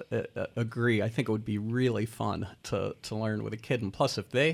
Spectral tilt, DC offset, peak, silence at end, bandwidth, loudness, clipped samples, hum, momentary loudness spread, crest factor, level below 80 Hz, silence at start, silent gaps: -6 dB/octave; under 0.1%; -14 dBFS; 0 s; 14.5 kHz; -31 LUFS; under 0.1%; none; 7 LU; 18 dB; -62 dBFS; 0 s; none